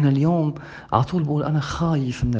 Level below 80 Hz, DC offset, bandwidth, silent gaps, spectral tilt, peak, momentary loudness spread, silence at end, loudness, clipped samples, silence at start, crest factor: -40 dBFS; under 0.1%; 7.8 kHz; none; -8 dB/octave; -2 dBFS; 5 LU; 0 s; -22 LUFS; under 0.1%; 0 s; 20 dB